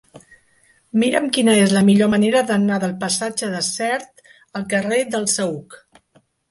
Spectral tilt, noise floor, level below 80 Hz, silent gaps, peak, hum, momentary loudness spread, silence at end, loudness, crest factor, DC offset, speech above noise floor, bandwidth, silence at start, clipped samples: -4.5 dB/octave; -59 dBFS; -60 dBFS; none; -2 dBFS; none; 10 LU; 0.75 s; -18 LUFS; 18 dB; under 0.1%; 41 dB; 11.5 kHz; 0.15 s; under 0.1%